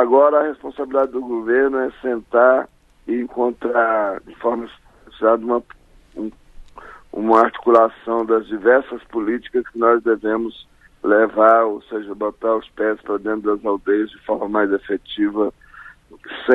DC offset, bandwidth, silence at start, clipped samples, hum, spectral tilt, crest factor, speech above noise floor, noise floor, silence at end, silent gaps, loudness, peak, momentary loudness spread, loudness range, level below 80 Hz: under 0.1%; 5.6 kHz; 0 s; under 0.1%; none; -7 dB/octave; 18 dB; 25 dB; -43 dBFS; 0 s; none; -19 LUFS; 0 dBFS; 13 LU; 4 LU; -52 dBFS